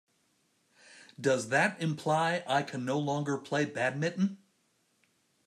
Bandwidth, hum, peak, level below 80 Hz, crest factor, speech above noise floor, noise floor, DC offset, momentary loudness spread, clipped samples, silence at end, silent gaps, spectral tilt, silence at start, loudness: 13 kHz; none; -14 dBFS; -78 dBFS; 20 dB; 43 dB; -73 dBFS; under 0.1%; 6 LU; under 0.1%; 1.1 s; none; -5 dB/octave; 0.9 s; -31 LUFS